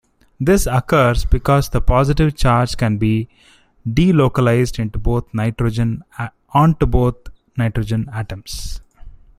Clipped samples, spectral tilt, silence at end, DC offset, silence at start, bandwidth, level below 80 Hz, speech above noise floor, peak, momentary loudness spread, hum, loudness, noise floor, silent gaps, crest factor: under 0.1%; -7 dB/octave; 0.25 s; under 0.1%; 0.4 s; 15.5 kHz; -26 dBFS; 22 dB; -2 dBFS; 14 LU; none; -17 LUFS; -38 dBFS; none; 16 dB